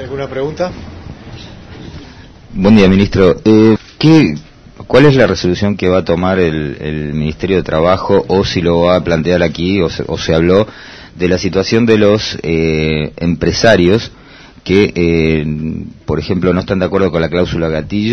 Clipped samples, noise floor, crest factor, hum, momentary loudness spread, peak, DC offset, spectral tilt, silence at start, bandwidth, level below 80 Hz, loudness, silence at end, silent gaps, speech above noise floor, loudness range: 0.5%; -35 dBFS; 12 dB; none; 18 LU; 0 dBFS; under 0.1%; -6.5 dB/octave; 0 s; 7.4 kHz; -32 dBFS; -12 LUFS; 0 s; none; 24 dB; 4 LU